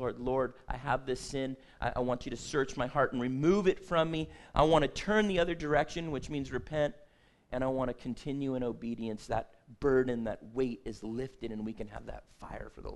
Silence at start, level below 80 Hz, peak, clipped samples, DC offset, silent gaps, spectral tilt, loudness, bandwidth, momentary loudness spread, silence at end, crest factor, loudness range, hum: 0 s; -48 dBFS; -10 dBFS; under 0.1%; under 0.1%; none; -6 dB/octave; -33 LUFS; 12 kHz; 12 LU; 0 s; 22 dB; 6 LU; none